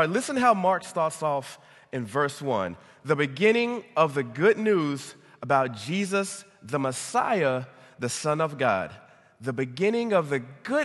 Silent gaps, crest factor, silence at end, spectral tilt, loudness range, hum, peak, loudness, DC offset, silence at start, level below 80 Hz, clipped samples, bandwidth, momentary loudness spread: none; 18 dB; 0 s; -5 dB/octave; 3 LU; none; -8 dBFS; -26 LUFS; under 0.1%; 0 s; -66 dBFS; under 0.1%; 12.5 kHz; 13 LU